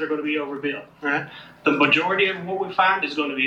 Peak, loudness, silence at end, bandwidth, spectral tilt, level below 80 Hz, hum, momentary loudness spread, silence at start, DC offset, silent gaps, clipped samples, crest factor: -4 dBFS; -22 LUFS; 0 s; 8 kHz; -5.5 dB/octave; -68 dBFS; none; 11 LU; 0 s; under 0.1%; none; under 0.1%; 20 dB